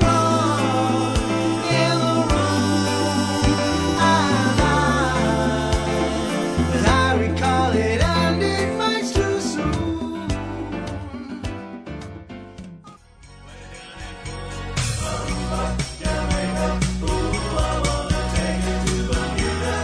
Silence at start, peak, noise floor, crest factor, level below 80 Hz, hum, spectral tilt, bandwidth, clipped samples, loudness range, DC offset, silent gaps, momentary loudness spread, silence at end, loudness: 0 s; -4 dBFS; -45 dBFS; 18 dB; -30 dBFS; none; -5 dB/octave; 11 kHz; under 0.1%; 13 LU; under 0.1%; none; 15 LU; 0 s; -21 LUFS